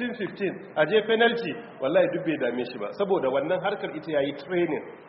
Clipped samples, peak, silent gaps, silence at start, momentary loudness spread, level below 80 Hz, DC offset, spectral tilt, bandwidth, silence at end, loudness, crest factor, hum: under 0.1%; -8 dBFS; none; 0 s; 9 LU; -70 dBFS; under 0.1%; -3 dB/octave; 5.8 kHz; 0 s; -26 LUFS; 18 dB; none